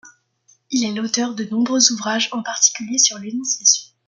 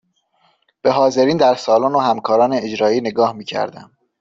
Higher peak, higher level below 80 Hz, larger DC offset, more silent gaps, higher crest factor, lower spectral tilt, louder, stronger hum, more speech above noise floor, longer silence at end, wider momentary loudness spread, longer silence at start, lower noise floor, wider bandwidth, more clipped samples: about the same, 0 dBFS vs -2 dBFS; second, -70 dBFS vs -60 dBFS; neither; neither; first, 20 dB vs 14 dB; second, -1 dB/octave vs -5.5 dB/octave; about the same, -17 LUFS vs -16 LUFS; neither; second, 39 dB vs 45 dB; second, 0.2 s vs 0.35 s; about the same, 8 LU vs 9 LU; second, 0.05 s vs 0.85 s; about the same, -59 dBFS vs -61 dBFS; first, 11 kHz vs 7.6 kHz; neither